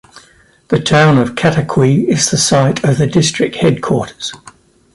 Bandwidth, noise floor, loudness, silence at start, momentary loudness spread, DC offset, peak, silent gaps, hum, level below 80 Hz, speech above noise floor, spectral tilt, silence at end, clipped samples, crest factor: 11.5 kHz; -48 dBFS; -12 LUFS; 0.15 s; 8 LU; under 0.1%; 0 dBFS; none; none; -44 dBFS; 35 dB; -5 dB/octave; 0.6 s; under 0.1%; 14 dB